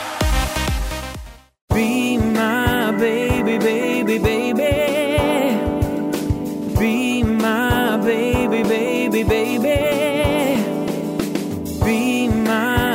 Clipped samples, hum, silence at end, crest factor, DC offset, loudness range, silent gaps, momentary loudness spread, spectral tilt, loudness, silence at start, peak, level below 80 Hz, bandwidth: under 0.1%; none; 0 s; 12 dB; under 0.1%; 1 LU; 1.61-1.68 s; 5 LU; -5.5 dB/octave; -19 LUFS; 0 s; -6 dBFS; -30 dBFS; 16.5 kHz